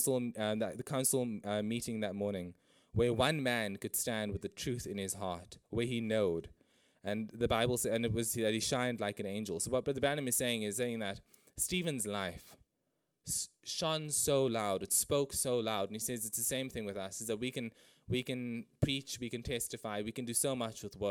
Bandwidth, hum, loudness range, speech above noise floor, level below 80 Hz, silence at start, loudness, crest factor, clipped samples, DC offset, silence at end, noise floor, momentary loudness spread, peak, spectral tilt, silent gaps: 19 kHz; none; 5 LU; 47 dB; -60 dBFS; 0 s; -35 LUFS; 22 dB; under 0.1%; under 0.1%; 0 s; -83 dBFS; 9 LU; -14 dBFS; -3.5 dB/octave; none